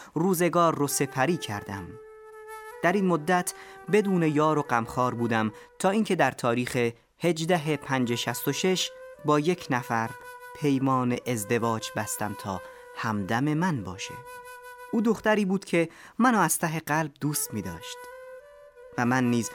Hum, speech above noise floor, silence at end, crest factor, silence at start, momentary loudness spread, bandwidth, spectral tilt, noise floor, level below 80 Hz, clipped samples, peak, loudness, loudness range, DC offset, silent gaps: none; 23 dB; 0 s; 18 dB; 0 s; 18 LU; 19 kHz; -5 dB/octave; -50 dBFS; -64 dBFS; under 0.1%; -8 dBFS; -27 LUFS; 3 LU; under 0.1%; none